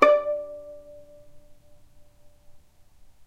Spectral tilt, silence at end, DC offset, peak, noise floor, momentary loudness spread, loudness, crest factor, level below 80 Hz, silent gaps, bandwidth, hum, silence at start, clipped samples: -4 dB/octave; 0.7 s; under 0.1%; -2 dBFS; -52 dBFS; 27 LU; -25 LUFS; 26 dB; -58 dBFS; none; 8.4 kHz; none; 0 s; under 0.1%